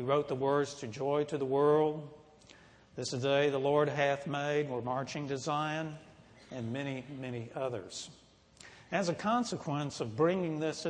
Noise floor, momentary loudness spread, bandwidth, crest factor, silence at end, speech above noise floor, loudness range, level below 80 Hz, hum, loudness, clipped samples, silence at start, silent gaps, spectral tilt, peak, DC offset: -59 dBFS; 14 LU; 10 kHz; 18 dB; 0 s; 26 dB; 7 LU; -70 dBFS; none; -33 LUFS; under 0.1%; 0 s; none; -5.5 dB/octave; -16 dBFS; under 0.1%